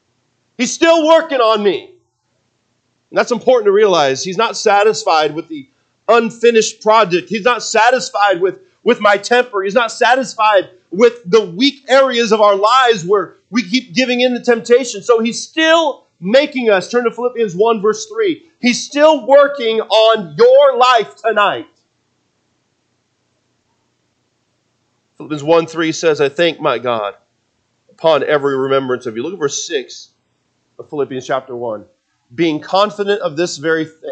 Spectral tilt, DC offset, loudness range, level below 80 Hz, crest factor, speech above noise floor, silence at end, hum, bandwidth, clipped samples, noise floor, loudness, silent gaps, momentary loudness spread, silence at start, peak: -3.5 dB/octave; under 0.1%; 8 LU; -68 dBFS; 14 dB; 51 dB; 0 s; none; 9 kHz; under 0.1%; -65 dBFS; -13 LUFS; none; 10 LU; 0.6 s; 0 dBFS